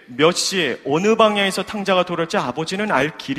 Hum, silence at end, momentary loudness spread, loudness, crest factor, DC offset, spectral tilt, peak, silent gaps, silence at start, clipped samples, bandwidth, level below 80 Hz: none; 0 s; 7 LU; -19 LUFS; 18 dB; under 0.1%; -3.5 dB/octave; 0 dBFS; none; 0.1 s; under 0.1%; 15.5 kHz; -58 dBFS